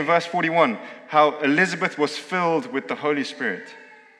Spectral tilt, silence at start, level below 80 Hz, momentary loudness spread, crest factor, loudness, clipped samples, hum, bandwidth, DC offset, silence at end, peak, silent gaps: -5 dB/octave; 0 s; -84 dBFS; 9 LU; 20 dB; -22 LUFS; under 0.1%; none; 11.5 kHz; under 0.1%; 0.35 s; -4 dBFS; none